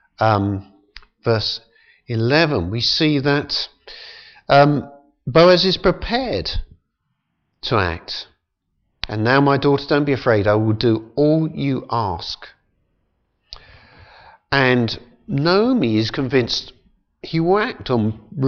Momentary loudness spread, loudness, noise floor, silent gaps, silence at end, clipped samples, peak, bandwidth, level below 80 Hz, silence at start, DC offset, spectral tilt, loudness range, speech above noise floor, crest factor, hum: 15 LU; -18 LUFS; -73 dBFS; none; 0 s; under 0.1%; -2 dBFS; 7 kHz; -42 dBFS; 0.2 s; under 0.1%; -6.5 dB/octave; 6 LU; 55 dB; 18 dB; none